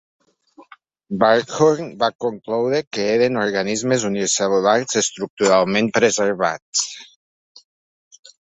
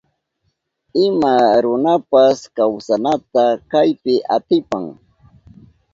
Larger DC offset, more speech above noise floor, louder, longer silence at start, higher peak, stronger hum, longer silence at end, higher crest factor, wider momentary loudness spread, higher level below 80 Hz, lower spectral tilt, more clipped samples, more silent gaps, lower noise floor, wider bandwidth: neither; second, 32 dB vs 54 dB; second, -19 LUFS vs -16 LUFS; second, 0.6 s vs 0.95 s; about the same, -2 dBFS vs 0 dBFS; neither; first, 1.5 s vs 1 s; about the same, 18 dB vs 16 dB; about the same, 6 LU vs 6 LU; about the same, -62 dBFS vs -58 dBFS; second, -3.5 dB/octave vs -6 dB/octave; neither; first, 2.15-2.19 s, 2.87-2.91 s, 5.30-5.37 s, 6.62-6.73 s vs none; second, -50 dBFS vs -69 dBFS; about the same, 8.4 kHz vs 7.8 kHz